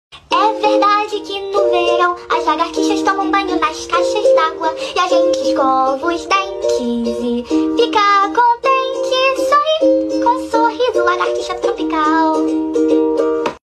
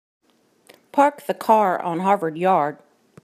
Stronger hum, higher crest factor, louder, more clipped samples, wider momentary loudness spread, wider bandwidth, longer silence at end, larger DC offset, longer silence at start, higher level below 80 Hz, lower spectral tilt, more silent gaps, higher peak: neither; second, 12 dB vs 18 dB; first, -15 LUFS vs -20 LUFS; neither; about the same, 6 LU vs 8 LU; second, 13 kHz vs 15.5 kHz; second, 0.1 s vs 0.5 s; neither; second, 0.1 s vs 0.95 s; first, -50 dBFS vs -80 dBFS; second, -3 dB/octave vs -6.5 dB/octave; neither; about the same, -2 dBFS vs -2 dBFS